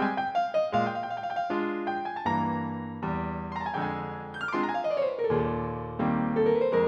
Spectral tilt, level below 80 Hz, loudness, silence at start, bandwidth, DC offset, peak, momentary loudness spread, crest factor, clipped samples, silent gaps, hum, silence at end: -8 dB/octave; -54 dBFS; -29 LUFS; 0 s; 7.8 kHz; under 0.1%; -14 dBFS; 8 LU; 14 dB; under 0.1%; none; none; 0 s